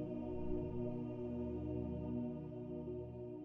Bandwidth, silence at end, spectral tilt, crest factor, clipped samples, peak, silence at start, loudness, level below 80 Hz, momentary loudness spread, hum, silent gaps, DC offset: 3.6 kHz; 0 s; -10.5 dB/octave; 14 dB; under 0.1%; -28 dBFS; 0 s; -44 LUFS; -56 dBFS; 4 LU; 60 Hz at -50 dBFS; none; under 0.1%